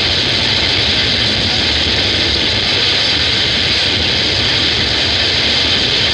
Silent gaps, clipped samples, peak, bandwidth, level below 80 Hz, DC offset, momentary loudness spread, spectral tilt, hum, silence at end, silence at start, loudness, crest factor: none; under 0.1%; 0 dBFS; 11.5 kHz; -30 dBFS; under 0.1%; 1 LU; -3 dB/octave; none; 0 s; 0 s; -11 LUFS; 12 dB